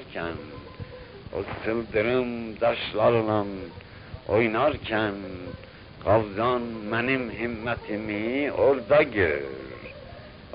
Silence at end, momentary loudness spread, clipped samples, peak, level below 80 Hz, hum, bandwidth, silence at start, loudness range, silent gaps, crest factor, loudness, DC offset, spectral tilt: 0 s; 19 LU; under 0.1%; -8 dBFS; -48 dBFS; none; 5.4 kHz; 0 s; 2 LU; none; 18 dB; -26 LUFS; under 0.1%; -10.5 dB/octave